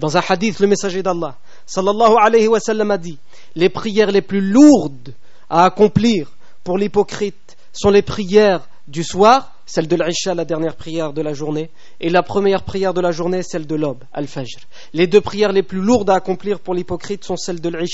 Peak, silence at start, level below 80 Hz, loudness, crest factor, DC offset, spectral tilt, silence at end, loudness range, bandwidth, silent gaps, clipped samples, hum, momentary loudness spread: 0 dBFS; 0 s; -48 dBFS; -16 LUFS; 16 dB; 4%; -5 dB/octave; 0 s; 5 LU; 8 kHz; none; under 0.1%; none; 14 LU